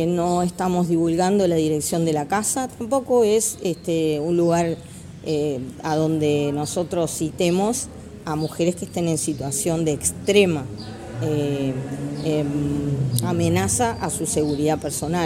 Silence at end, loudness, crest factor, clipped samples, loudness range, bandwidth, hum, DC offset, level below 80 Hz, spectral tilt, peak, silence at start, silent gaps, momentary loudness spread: 0 s; -22 LUFS; 20 dB; under 0.1%; 3 LU; 16.5 kHz; none; under 0.1%; -48 dBFS; -5 dB/octave; -2 dBFS; 0 s; none; 8 LU